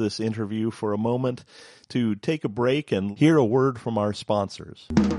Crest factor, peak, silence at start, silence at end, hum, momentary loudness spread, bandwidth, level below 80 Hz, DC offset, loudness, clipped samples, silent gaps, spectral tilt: 18 dB; -6 dBFS; 0 s; 0 s; none; 9 LU; 11.5 kHz; -50 dBFS; under 0.1%; -24 LUFS; under 0.1%; none; -7 dB/octave